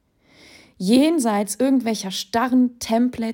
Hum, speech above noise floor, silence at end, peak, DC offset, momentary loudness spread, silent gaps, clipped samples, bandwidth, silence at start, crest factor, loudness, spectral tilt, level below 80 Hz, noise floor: none; 33 dB; 0 s; -6 dBFS; under 0.1%; 7 LU; none; under 0.1%; 17 kHz; 0.8 s; 16 dB; -20 LUFS; -4.5 dB/octave; -58 dBFS; -52 dBFS